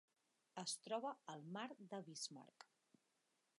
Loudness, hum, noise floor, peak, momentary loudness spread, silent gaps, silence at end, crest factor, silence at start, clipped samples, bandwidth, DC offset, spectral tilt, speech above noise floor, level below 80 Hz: -50 LUFS; none; -86 dBFS; -34 dBFS; 18 LU; none; 0.95 s; 20 dB; 0.55 s; under 0.1%; 11.5 kHz; under 0.1%; -3 dB/octave; 35 dB; under -90 dBFS